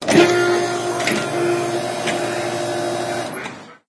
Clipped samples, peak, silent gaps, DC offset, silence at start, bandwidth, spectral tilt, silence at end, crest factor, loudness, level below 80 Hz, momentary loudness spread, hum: under 0.1%; 0 dBFS; none; under 0.1%; 0 s; 11 kHz; -4 dB/octave; 0.15 s; 20 dB; -20 LUFS; -60 dBFS; 10 LU; none